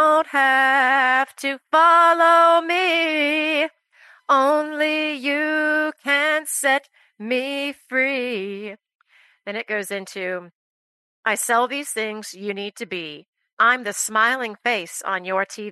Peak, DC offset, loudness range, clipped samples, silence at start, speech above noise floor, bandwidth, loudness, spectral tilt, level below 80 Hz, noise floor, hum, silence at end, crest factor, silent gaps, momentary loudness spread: -4 dBFS; under 0.1%; 10 LU; under 0.1%; 0 s; 32 dB; 12.5 kHz; -19 LUFS; -2 dB/octave; -82 dBFS; -52 dBFS; none; 0 s; 16 dB; 8.95-8.99 s, 10.55-11.23 s, 13.28-13.33 s, 13.53-13.57 s; 15 LU